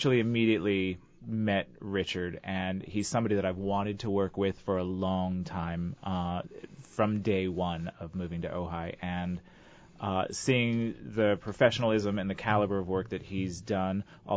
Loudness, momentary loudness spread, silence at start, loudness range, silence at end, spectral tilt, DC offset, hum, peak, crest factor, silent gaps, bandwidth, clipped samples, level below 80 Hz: -31 LUFS; 10 LU; 0 s; 5 LU; 0 s; -6 dB/octave; under 0.1%; none; -10 dBFS; 20 dB; none; 8 kHz; under 0.1%; -52 dBFS